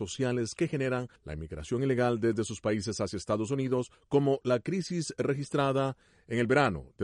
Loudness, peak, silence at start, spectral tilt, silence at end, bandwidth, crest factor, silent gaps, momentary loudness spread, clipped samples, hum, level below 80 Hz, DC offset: -30 LUFS; -12 dBFS; 0 s; -6 dB/octave; 0 s; 11.5 kHz; 18 dB; none; 8 LU; under 0.1%; none; -56 dBFS; under 0.1%